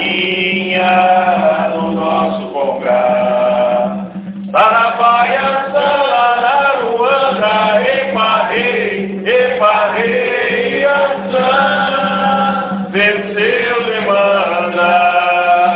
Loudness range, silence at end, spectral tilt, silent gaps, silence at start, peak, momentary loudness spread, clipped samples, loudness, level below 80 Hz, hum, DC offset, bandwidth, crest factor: 1 LU; 0 s; -8 dB/octave; none; 0 s; 0 dBFS; 6 LU; under 0.1%; -13 LUFS; -52 dBFS; none; under 0.1%; 5.4 kHz; 12 dB